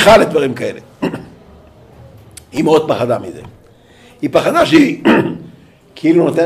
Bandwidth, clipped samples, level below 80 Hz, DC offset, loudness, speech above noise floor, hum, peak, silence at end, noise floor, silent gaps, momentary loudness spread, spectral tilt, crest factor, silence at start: 15.5 kHz; under 0.1%; -44 dBFS; under 0.1%; -13 LUFS; 32 dB; none; 0 dBFS; 0 s; -44 dBFS; none; 15 LU; -5.5 dB/octave; 14 dB; 0 s